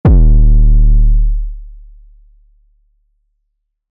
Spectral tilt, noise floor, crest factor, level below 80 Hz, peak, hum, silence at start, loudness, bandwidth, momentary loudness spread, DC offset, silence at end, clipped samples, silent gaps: -12.5 dB/octave; -68 dBFS; 6 dB; -10 dBFS; -4 dBFS; none; 0.05 s; -13 LUFS; 1.8 kHz; 16 LU; under 0.1%; 2.3 s; under 0.1%; none